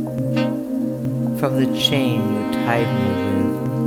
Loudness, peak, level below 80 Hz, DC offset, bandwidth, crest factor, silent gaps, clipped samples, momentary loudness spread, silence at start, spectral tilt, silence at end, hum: -20 LUFS; -2 dBFS; -52 dBFS; under 0.1%; 18 kHz; 18 dB; none; under 0.1%; 6 LU; 0 s; -6 dB/octave; 0 s; none